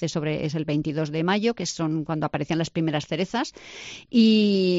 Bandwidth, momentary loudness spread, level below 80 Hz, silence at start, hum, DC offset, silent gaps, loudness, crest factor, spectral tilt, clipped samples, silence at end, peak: 8 kHz; 10 LU; -58 dBFS; 0 s; none; under 0.1%; none; -24 LUFS; 16 dB; -5 dB/octave; under 0.1%; 0 s; -8 dBFS